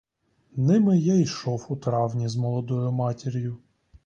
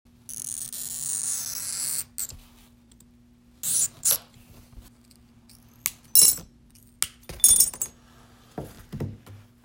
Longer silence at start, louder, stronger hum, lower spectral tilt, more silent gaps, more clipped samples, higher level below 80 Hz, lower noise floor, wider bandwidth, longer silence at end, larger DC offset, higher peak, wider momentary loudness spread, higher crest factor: first, 0.55 s vs 0.3 s; second, -25 LUFS vs -22 LUFS; neither; first, -7.5 dB/octave vs 0 dB/octave; neither; neither; second, -60 dBFS vs -54 dBFS; first, -65 dBFS vs -56 dBFS; second, 7.6 kHz vs over 20 kHz; first, 0.5 s vs 0.25 s; neither; second, -10 dBFS vs 0 dBFS; second, 11 LU vs 21 LU; second, 14 dB vs 28 dB